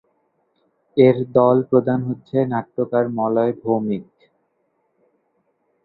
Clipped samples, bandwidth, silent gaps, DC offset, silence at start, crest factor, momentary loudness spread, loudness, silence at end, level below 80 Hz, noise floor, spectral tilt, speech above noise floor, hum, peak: under 0.1%; 4.6 kHz; none; under 0.1%; 0.95 s; 20 dB; 8 LU; -19 LUFS; 1.8 s; -60 dBFS; -68 dBFS; -11.5 dB/octave; 50 dB; none; 0 dBFS